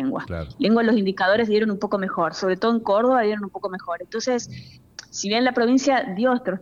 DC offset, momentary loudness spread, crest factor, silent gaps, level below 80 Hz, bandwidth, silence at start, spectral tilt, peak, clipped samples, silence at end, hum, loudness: under 0.1%; 12 LU; 14 dB; none; -52 dBFS; 7.4 kHz; 0 s; -5 dB/octave; -8 dBFS; under 0.1%; 0.05 s; none; -22 LUFS